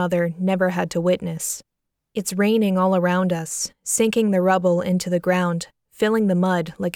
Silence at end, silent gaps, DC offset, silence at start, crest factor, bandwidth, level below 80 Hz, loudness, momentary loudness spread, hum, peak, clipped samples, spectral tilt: 0.05 s; none; under 0.1%; 0 s; 14 dB; 17 kHz; -60 dBFS; -21 LUFS; 8 LU; none; -6 dBFS; under 0.1%; -5 dB/octave